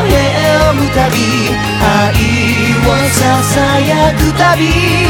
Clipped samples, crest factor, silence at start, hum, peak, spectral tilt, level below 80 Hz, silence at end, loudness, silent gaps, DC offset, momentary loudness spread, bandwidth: under 0.1%; 10 dB; 0 s; none; 0 dBFS; -5 dB/octave; -22 dBFS; 0 s; -10 LUFS; none; under 0.1%; 2 LU; 18 kHz